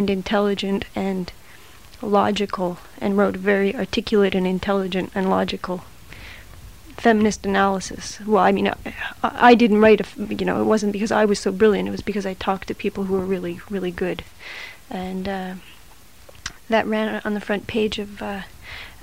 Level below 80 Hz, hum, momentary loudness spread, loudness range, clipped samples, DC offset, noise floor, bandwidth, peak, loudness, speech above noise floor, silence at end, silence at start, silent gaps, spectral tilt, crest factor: -46 dBFS; none; 17 LU; 9 LU; under 0.1%; 0.5%; -48 dBFS; 16 kHz; 0 dBFS; -21 LUFS; 28 dB; 0 s; 0 s; none; -5.5 dB/octave; 20 dB